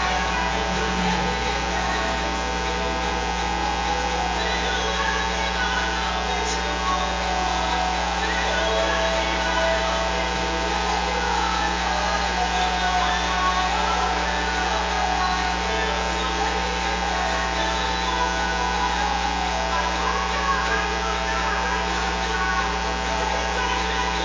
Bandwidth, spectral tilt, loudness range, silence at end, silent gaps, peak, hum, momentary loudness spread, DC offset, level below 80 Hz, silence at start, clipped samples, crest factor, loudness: 7.6 kHz; -3 dB/octave; 2 LU; 0 s; none; -8 dBFS; none; 2 LU; under 0.1%; -32 dBFS; 0 s; under 0.1%; 14 dB; -23 LUFS